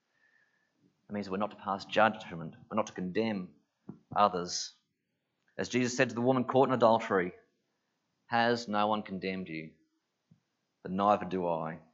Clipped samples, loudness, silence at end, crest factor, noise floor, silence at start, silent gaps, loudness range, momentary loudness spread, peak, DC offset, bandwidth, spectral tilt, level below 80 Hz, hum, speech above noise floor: under 0.1%; -31 LUFS; 0.15 s; 22 dB; -82 dBFS; 1.1 s; none; 5 LU; 15 LU; -10 dBFS; under 0.1%; 8 kHz; -5 dB/octave; -76 dBFS; none; 52 dB